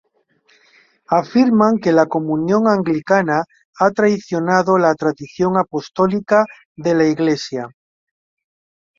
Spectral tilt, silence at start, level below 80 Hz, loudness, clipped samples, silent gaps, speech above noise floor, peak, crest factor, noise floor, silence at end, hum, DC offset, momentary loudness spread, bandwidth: -6.5 dB/octave; 1.1 s; -58 dBFS; -17 LUFS; under 0.1%; 3.65-3.73 s, 6.65-6.75 s; 43 dB; -2 dBFS; 16 dB; -59 dBFS; 1.3 s; none; under 0.1%; 8 LU; 7.6 kHz